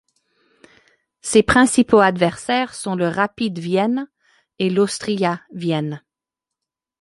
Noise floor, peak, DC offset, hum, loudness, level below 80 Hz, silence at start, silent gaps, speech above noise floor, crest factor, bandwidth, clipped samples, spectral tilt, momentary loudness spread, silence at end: -86 dBFS; -2 dBFS; under 0.1%; none; -19 LUFS; -48 dBFS; 1.25 s; none; 68 dB; 18 dB; 11.5 kHz; under 0.1%; -5 dB/octave; 12 LU; 1.05 s